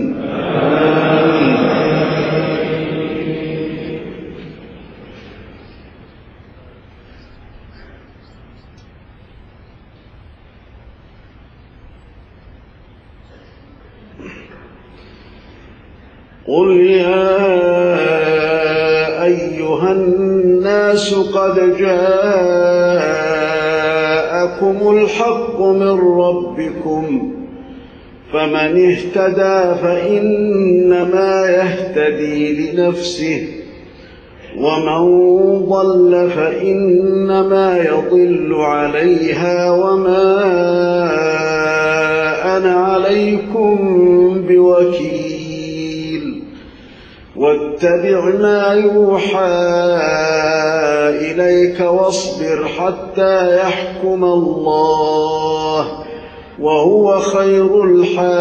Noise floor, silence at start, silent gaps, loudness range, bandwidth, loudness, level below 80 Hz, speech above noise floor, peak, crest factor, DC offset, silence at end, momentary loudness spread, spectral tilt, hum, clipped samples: -42 dBFS; 0 s; none; 5 LU; 8.8 kHz; -13 LUFS; -46 dBFS; 30 dB; 0 dBFS; 14 dB; under 0.1%; 0 s; 10 LU; -6 dB/octave; none; under 0.1%